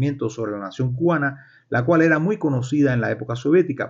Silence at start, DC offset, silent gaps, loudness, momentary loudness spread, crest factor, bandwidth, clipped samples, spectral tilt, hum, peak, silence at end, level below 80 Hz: 0 s; under 0.1%; none; -21 LUFS; 9 LU; 16 dB; 7.6 kHz; under 0.1%; -8 dB/octave; none; -6 dBFS; 0 s; -56 dBFS